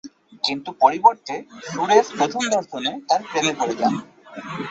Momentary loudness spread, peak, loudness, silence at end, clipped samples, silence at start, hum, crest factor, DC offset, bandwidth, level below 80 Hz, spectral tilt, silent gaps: 15 LU; -2 dBFS; -20 LUFS; 0 s; under 0.1%; 0.05 s; none; 20 dB; under 0.1%; 8.2 kHz; -66 dBFS; -3 dB/octave; none